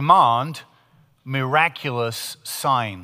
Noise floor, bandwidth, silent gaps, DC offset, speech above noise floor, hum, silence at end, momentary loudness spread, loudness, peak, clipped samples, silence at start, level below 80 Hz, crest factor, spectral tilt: -57 dBFS; 16 kHz; none; under 0.1%; 37 dB; none; 0 s; 14 LU; -21 LUFS; -2 dBFS; under 0.1%; 0 s; -64 dBFS; 20 dB; -4.5 dB/octave